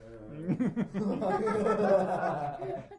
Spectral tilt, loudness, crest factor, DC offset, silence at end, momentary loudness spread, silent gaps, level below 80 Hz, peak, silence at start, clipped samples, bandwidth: -8 dB/octave; -30 LUFS; 16 dB; under 0.1%; 0 s; 11 LU; none; -60 dBFS; -14 dBFS; 0 s; under 0.1%; 11 kHz